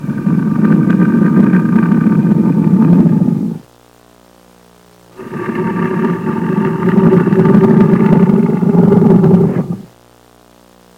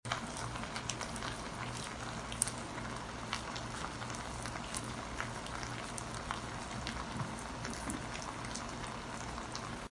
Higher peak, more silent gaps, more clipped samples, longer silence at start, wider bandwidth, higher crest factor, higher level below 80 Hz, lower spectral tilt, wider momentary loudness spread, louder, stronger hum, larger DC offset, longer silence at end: first, 0 dBFS vs -8 dBFS; neither; neither; about the same, 0 s vs 0.05 s; second, 4.7 kHz vs 11.5 kHz; second, 12 dB vs 32 dB; first, -44 dBFS vs -54 dBFS; first, -10 dB/octave vs -3.5 dB/octave; first, 10 LU vs 3 LU; first, -11 LUFS vs -41 LUFS; first, 60 Hz at -35 dBFS vs none; neither; first, 1.15 s vs 0.05 s